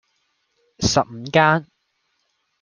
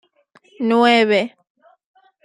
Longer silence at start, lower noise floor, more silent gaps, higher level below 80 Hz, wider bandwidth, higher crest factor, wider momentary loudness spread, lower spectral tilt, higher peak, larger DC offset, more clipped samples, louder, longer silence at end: first, 0.8 s vs 0.6 s; first, -70 dBFS vs -55 dBFS; neither; first, -48 dBFS vs -70 dBFS; about the same, 10 kHz vs 11 kHz; about the same, 22 dB vs 18 dB; second, 7 LU vs 12 LU; about the same, -4 dB/octave vs -5 dB/octave; about the same, -2 dBFS vs -2 dBFS; neither; neither; second, -19 LUFS vs -16 LUFS; about the same, 1 s vs 0.95 s